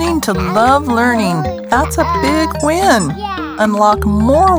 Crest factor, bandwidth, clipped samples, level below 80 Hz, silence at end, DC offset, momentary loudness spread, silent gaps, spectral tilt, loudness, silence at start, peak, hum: 12 dB; over 20 kHz; under 0.1%; -28 dBFS; 0 s; under 0.1%; 5 LU; none; -5 dB/octave; -13 LUFS; 0 s; 0 dBFS; none